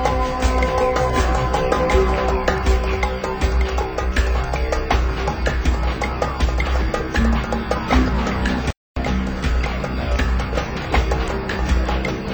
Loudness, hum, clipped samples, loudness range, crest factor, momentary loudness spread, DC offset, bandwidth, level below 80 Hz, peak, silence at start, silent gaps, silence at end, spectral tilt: -21 LUFS; none; under 0.1%; 3 LU; 16 dB; 5 LU; under 0.1%; over 20 kHz; -22 dBFS; -4 dBFS; 0 s; 8.77-8.95 s; 0 s; -6 dB/octave